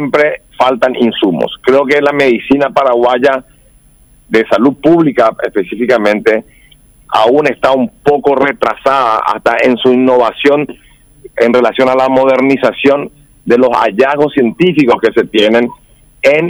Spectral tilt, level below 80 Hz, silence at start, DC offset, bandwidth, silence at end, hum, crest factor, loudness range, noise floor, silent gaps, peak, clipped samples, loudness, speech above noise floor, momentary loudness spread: -6 dB/octave; -46 dBFS; 0 s; under 0.1%; over 20 kHz; 0 s; none; 10 dB; 2 LU; -44 dBFS; none; 0 dBFS; under 0.1%; -10 LUFS; 35 dB; 5 LU